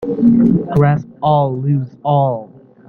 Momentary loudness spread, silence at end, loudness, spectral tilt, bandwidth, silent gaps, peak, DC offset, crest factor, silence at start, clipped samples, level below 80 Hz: 7 LU; 0.4 s; -15 LUFS; -10.5 dB/octave; 4.3 kHz; none; -2 dBFS; under 0.1%; 14 dB; 0 s; under 0.1%; -44 dBFS